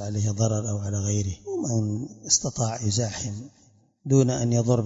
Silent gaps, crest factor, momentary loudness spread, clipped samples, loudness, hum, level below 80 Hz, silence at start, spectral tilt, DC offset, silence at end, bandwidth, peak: none; 18 dB; 11 LU; under 0.1%; -25 LUFS; none; -56 dBFS; 0 s; -5 dB/octave; under 0.1%; 0 s; 8 kHz; -6 dBFS